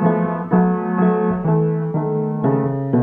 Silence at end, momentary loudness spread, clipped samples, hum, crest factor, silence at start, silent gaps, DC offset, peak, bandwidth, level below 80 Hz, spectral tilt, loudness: 0 s; 4 LU; under 0.1%; none; 14 dB; 0 s; none; under 0.1%; -4 dBFS; 3.5 kHz; -50 dBFS; -13 dB/octave; -19 LUFS